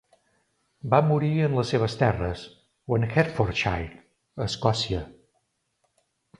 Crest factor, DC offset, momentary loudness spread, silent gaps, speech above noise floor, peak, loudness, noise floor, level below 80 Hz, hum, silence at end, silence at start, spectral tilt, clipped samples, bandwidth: 22 dB; under 0.1%; 17 LU; none; 49 dB; -4 dBFS; -25 LUFS; -74 dBFS; -46 dBFS; none; 1.3 s; 0.85 s; -6.5 dB/octave; under 0.1%; 11 kHz